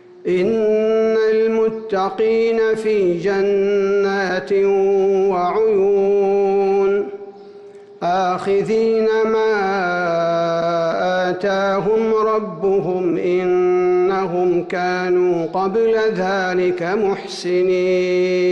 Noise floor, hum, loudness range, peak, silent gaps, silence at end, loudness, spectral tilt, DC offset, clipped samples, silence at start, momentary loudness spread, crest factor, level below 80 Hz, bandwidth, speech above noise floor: -39 dBFS; none; 2 LU; -10 dBFS; none; 0 s; -17 LUFS; -6.5 dB/octave; under 0.1%; under 0.1%; 0.15 s; 4 LU; 8 dB; -56 dBFS; 8.6 kHz; 23 dB